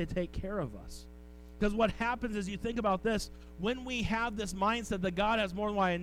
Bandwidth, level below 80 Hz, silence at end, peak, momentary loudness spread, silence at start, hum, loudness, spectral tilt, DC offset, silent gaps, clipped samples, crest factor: 16 kHz; -46 dBFS; 0 s; -16 dBFS; 15 LU; 0 s; none; -33 LUFS; -5 dB/octave; under 0.1%; none; under 0.1%; 16 dB